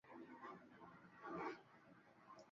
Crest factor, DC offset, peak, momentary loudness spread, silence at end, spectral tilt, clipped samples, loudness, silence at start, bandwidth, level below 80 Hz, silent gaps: 20 dB; under 0.1%; -36 dBFS; 17 LU; 0 s; -4.5 dB/octave; under 0.1%; -56 LUFS; 0.05 s; 7.2 kHz; -88 dBFS; none